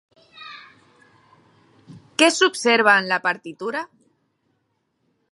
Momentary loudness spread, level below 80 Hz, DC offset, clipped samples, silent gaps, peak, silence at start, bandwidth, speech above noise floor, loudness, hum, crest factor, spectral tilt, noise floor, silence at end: 24 LU; -78 dBFS; under 0.1%; under 0.1%; none; -2 dBFS; 0.4 s; 11.5 kHz; 52 dB; -19 LUFS; none; 22 dB; -2 dB/octave; -71 dBFS; 1.45 s